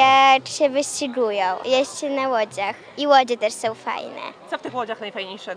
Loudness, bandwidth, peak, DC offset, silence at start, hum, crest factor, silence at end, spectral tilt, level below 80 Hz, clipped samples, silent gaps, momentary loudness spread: -21 LUFS; 10.5 kHz; -2 dBFS; under 0.1%; 0 s; none; 18 dB; 0 s; -2 dB/octave; -74 dBFS; under 0.1%; none; 14 LU